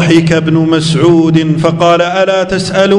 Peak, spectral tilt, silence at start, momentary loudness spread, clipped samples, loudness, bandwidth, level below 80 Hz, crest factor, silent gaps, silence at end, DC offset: 0 dBFS; -6 dB/octave; 0 s; 3 LU; 1%; -9 LUFS; 11 kHz; -40 dBFS; 8 dB; none; 0 s; under 0.1%